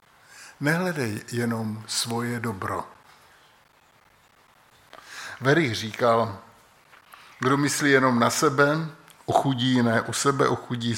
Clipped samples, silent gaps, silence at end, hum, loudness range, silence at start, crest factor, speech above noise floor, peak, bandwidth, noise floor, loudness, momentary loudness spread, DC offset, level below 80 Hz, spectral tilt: under 0.1%; none; 0 s; none; 10 LU; 0.35 s; 20 dB; 35 dB; -4 dBFS; 17 kHz; -59 dBFS; -24 LUFS; 12 LU; under 0.1%; -68 dBFS; -4.5 dB/octave